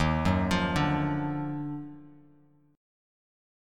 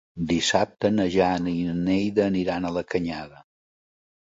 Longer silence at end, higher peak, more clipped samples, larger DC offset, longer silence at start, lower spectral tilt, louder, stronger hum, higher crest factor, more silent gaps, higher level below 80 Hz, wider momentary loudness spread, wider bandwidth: about the same, 0.95 s vs 0.95 s; second, -12 dBFS vs -6 dBFS; neither; neither; second, 0 s vs 0.15 s; first, -6.5 dB/octave vs -5 dB/octave; second, -29 LUFS vs -24 LUFS; neither; about the same, 20 dB vs 20 dB; neither; first, -44 dBFS vs -50 dBFS; first, 15 LU vs 6 LU; first, 14.5 kHz vs 7.8 kHz